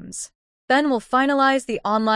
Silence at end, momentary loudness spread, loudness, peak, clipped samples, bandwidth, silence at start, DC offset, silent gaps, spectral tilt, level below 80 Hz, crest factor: 0 s; 15 LU; -20 LUFS; -8 dBFS; under 0.1%; 12 kHz; 0 s; under 0.1%; 0.35-0.68 s; -3.5 dB/octave; -58 dBFS; 14 dB